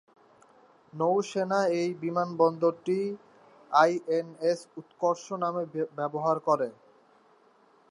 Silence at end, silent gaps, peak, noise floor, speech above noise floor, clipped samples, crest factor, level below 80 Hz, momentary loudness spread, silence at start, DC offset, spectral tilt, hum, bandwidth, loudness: 1.2 s; none; -8 dBFS; -62 dBFS; 34 dB; under 0.1%; 22 dB; -84 dBFS; 9 LU; 0.95 s; under 0.1%; -6 dB/octave; none; 11 kHz; -28 LUFS